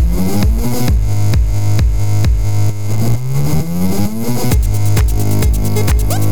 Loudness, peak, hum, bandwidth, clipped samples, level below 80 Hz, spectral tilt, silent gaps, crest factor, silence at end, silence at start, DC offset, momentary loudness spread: -15 LUFS; -2 dBFS; none; over 20 kHz; under 0.1%; -18 dBFS; -6.5 dB/octave; none; 12 dB; 0 s; 0 s; 20%; 3 LU